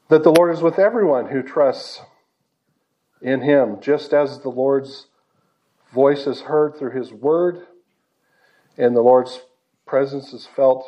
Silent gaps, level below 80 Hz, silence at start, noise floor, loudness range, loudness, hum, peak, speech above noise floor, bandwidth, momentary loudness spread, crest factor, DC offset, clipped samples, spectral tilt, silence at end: none; -78 dBFS; 0.1 s; -70 dBFS; 2 LU; -18 LUFS; none; 0 dBFS; 53 dB; 12.5 kHz; 17 LU; 20 dB; under 0.1%; under 0.1%; -6.5 dB/octave; 0 s